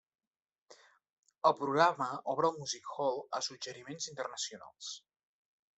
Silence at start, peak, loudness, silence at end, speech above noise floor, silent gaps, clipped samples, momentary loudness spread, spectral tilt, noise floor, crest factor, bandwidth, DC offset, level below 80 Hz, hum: 0.7 s; -12 dBFS; -34 LUFS; 0.8 s; over 56 dB; 1.13-1.23 s; under 0.1%; 16 LU; -3 dB/octave; under -90 dBFS; 24 dB; 8.2 kHz; under 0.1%; -84 dBFS; none